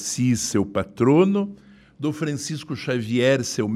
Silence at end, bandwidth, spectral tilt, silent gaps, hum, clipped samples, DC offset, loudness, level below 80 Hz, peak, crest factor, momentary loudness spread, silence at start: 0 s; 15 kHz; -5 dB/octave; none; none; under 0.1%; under 0.1%; -22 LUFS; -56 dBFS; -6 dBFS; 16 dB; 12 LU; 0 s